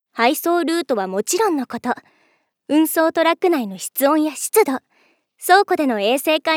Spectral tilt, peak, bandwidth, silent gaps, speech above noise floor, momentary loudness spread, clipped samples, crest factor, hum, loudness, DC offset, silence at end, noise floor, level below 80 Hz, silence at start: -2.5 dB/octave; 0 dBFS; 19 kHz; none; 45 dB; 9 LU; under 0.1%; 18 dB; none; -18 LUFS; under 0.1%; 0 s; -63 dBFS; -78 dBFS; 0.15 s